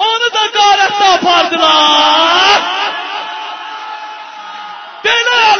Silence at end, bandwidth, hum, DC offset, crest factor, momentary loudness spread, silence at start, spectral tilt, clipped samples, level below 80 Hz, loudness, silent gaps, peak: 0 s; 8 kHz; none; under 0.1%; 12 dB; 19 LU; 0 s; -0.5 dB/octave; under 0.1%; -54 dBFS; -9 LUFS; none; 0 dBFS